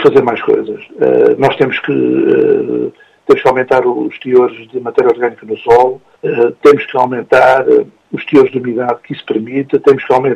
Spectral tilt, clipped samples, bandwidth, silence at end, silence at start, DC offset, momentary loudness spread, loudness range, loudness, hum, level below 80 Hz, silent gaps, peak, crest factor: -7 dB/octave; 0.2%; 8.6 kHz; 0 s; 0 s; under 0.1%; 10 LU; 2 LU; -12 LUFS; none; -52 dBFS; none; 0 dBFS; 12 dB